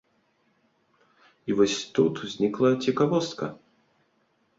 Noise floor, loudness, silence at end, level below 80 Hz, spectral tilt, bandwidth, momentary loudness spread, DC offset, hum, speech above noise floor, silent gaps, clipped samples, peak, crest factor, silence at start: -69 dBFS; -25 LUFS; 1.05 s; -66 dBFS; -5.5 dB/octave; 7.8 kHz; 11 LU; under 0.1%; none; 45 dB; none; under 0.1%; -8 dBFS; 20 dB; 1.45 s